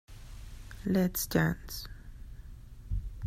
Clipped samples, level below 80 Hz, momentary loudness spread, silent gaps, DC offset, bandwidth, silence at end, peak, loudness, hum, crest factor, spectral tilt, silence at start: under 0.1%; -44 dBFS; 22 LU; none; under 0.1%; 16 kHz; 0 s; -14 dBFS; -32 LUFS; none; 20 dB; -5.5 dB/octave; 0.1 s